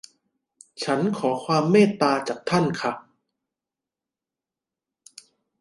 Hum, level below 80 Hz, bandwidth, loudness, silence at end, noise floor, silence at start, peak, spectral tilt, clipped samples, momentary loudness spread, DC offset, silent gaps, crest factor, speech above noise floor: none; -68 dBFS; 11.5 kHz; -22 LUFS; 2.6 s; -89 dBFS; 0.8 s; -4 dBFS; -6 dB/octave; under 0.1%; 11 LU; under 0.1%; none; 22 dB; 67 dB